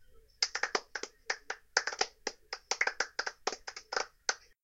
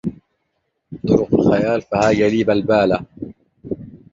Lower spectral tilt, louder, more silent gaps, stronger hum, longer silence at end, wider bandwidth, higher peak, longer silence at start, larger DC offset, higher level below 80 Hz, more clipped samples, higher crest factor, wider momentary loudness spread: second, 1.5 dB/octave vs -7 dB/octave; second, -35 LUFS vs -17 LUFS; neither; neither; about the same, 0.25 s vs 0.15 s; first, 16.5 kHz vs 7.8 kHz; second, -8 dBFS vs 0 dBFS; about the same, 0 s vs 0.05 s; neither; second, -68 dBFS vs -46 dBFS; neither; first, 30 dB vs 18 dB; second, 11 LU vs 18 LU